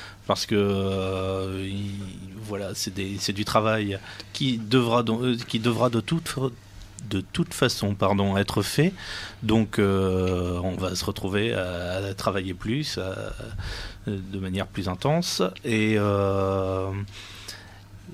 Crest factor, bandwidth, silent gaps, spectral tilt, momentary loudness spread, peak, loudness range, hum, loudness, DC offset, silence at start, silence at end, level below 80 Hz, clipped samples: 20 dB; 15.5 kHz; none; -5.5 dB/octave; 12 LU; -6 dBFS; 4 LU; none; -26 LUFS; under 0.1%; 0 s; 0 s; -48 dBFS; under 0.1%